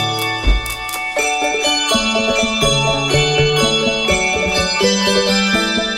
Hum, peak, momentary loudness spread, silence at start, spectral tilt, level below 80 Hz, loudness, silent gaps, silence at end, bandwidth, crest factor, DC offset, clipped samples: none; -2 dBFS; 5 LU; 0 s; -3 dB/octave; -28 dBFS; -15 LUFS; none; 0 s; 16.5 kHz; 14 dB; under 0.1%; under 0.1%